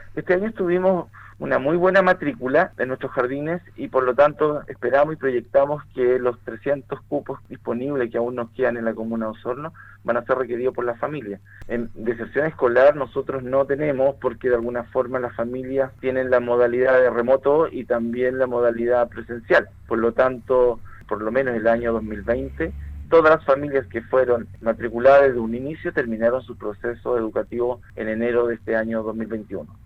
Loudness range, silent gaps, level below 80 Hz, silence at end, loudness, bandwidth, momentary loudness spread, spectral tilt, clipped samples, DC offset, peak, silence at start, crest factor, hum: 6 LU; none; -46 dBFS; 0.1 s; -22 LUFS; 6 kHz; 12 LU; -8.5 dB/octave; under 0.1%; under 0.1%; -6 dBFS; 0 s; 16 dB; none